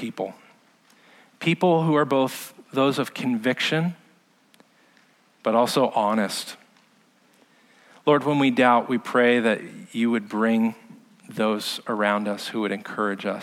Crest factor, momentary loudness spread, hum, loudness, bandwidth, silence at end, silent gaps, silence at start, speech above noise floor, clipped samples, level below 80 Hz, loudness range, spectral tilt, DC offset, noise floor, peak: 20 dB; 11 LU; none; -23 LUFS; 16 kHz; 0 s; none; 0 s; 37 dB; under 0.1%; -78 dBFS; 5 LU; -5.5 dB/octave; under 0.1%; -60 dBFS; -4 dBFS